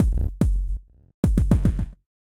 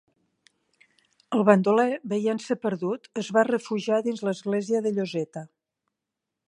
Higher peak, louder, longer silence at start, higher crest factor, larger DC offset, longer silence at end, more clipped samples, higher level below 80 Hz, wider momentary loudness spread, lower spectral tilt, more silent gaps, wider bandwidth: about the same, -4 dBFS vs -2 dBFS; about the same, -24 LUFS vs -25 LUFS; second, 0 s vs 1.3 s; second, 18 dB vs 24 dB; neither; second, 0.25 s vs 1 s; neither; first, -24 dBFS vs -76 dBFS; about the same, 13 LU vs 11 LU; first, -9 dB/octave vs -6.5 dB/octave; first, 1.14-1.23 s vs none; first, 13 kHz vs 11 kHz